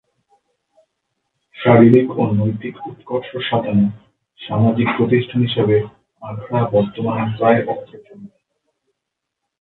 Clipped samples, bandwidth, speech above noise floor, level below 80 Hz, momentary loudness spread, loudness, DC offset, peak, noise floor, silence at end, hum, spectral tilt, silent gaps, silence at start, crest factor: under 0.1%; 4.1 kHz; 63 dB; -52 dBFS; 18 LU; -17 LUFS; under 0.1%; 0 dBFS; -79 dBFS; 1.35 s; none; -10.5 dB/octave; none; 1.55 s; 18 dB